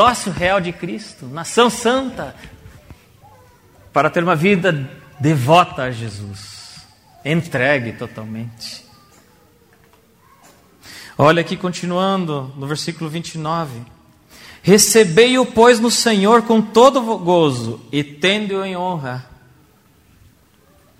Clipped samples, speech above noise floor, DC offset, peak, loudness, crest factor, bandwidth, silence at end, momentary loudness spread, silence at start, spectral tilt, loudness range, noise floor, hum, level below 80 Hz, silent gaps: under 0.1%; 36 dB; under 0.1%; 0 dBFS; -16 LUFS; 18 dB; 16 kHz; 1.75 s; 19 LU; 0 s; -4.5 dB/octave; 11 LU; -53 dBFS; none; -50 dBFS; none